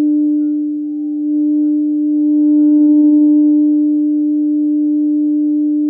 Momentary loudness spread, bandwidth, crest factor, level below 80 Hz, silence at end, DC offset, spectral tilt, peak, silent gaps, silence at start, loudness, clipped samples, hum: 8 LU; 0.9 kHz; 8 dB; -72 dBFS; 0 s; under 0.1%; -12.5 dB/octave; -4 dBFS; none; 0 s; -13 LUFS; under 0.1%; none